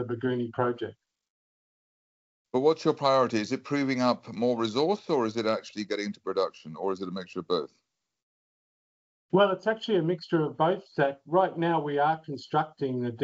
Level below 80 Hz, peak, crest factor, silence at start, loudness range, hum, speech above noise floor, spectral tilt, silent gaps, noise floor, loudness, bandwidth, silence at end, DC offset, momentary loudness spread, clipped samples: -76 dBFS; -10 dBFS; 18 dB; 0 s; 6 LU; none; over 62 dB; -4.5 dB/octave; 1.30-2.45 s, 8.23-9.29 s; under -90 dBFS; -28 LUFS; 8 kHz; 0 s; under 0.1%; 8 LU; under 0.1%